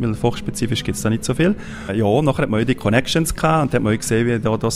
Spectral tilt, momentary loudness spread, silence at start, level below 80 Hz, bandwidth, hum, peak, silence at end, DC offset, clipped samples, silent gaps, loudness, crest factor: -5.5 dB/octave; 5 LU; 0 s; -38 dBFS; 16 kHz; none; 0 dBFS; 0 s; under 0.1%; under 0.1%; none; -19 LUFS; 18 dB